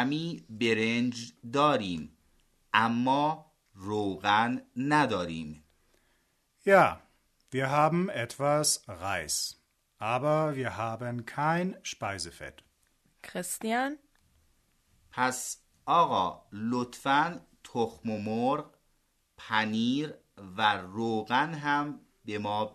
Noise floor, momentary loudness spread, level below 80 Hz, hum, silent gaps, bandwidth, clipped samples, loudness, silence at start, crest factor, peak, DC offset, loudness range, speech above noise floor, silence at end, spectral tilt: -72 dBFS; 14 LU; -66 dBFS; none; none; 13.5 kHz; under 0.1%; -29 LUFS; 0 s; 22 dB; -8 dBFS; under 0.1%; 6 LU; 43 dB; 0.05 s; -4 dB/octave